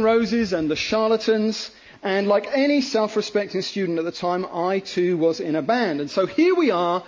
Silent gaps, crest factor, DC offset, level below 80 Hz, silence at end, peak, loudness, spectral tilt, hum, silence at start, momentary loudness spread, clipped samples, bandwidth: none; 14 dB; under 0.1%; -58 dBFS; 0 s; -8 dBFS; -22 LUFS; -5 dB/octave; none; 0 s; 6 LU; under 0.1%; 7.6 kHz